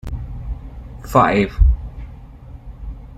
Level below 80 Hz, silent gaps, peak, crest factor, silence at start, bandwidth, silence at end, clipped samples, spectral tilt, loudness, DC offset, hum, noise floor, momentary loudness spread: -22 dBFS; none; -2 dBFS; 18 dB; 0.05 s; 13.5 kHz; 0.05 s; under 0.1%; -7.5 dB/octave; -18 LUFS; under 0.1%; none; -37 dBFS; 24 LU